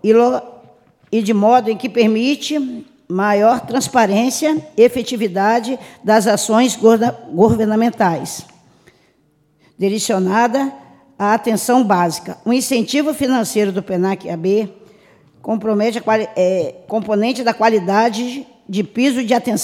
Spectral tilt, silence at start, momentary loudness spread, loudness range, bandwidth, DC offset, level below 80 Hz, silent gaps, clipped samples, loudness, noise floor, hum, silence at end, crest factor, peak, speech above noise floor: -5 dB/octave; 0.05 s; 10 LU; 4 LU; 16.5 kHz; under 0.1%; -56 dBFS; none; under 0.1%; -16 LUFS; -58 dBFS; none; 0 s; 16 dB; 0 dBFS; 43 dB